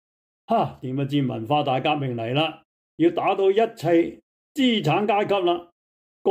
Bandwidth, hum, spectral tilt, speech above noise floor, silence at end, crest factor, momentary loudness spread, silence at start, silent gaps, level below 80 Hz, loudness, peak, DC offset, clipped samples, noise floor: 15.5 kHz; none; -7 dB/octave; over 68 dB; 0 s; 14 dB; 7 LU; 0.5 s; 2.65-2.98 s, 4.23-4.55 s, 5.72-6.25 s; -66 dBFS; -23 LUFS; -8 dBFS; under 0.1%; under 0.1%; under -90 dBFS